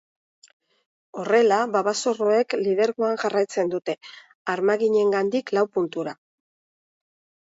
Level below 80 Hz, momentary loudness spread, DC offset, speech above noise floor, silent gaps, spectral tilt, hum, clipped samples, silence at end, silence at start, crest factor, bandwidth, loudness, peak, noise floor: -76 dBFS; 13 LU; under 0.1%; over 68 dB; 4.35-4.45 s; -4.5 dB/octave; none; under 0.1%; 1.3 s; 1.15 s; 16 dB; 8 kHz; -23 LUFS; -8 dBFS; under -90 dBFS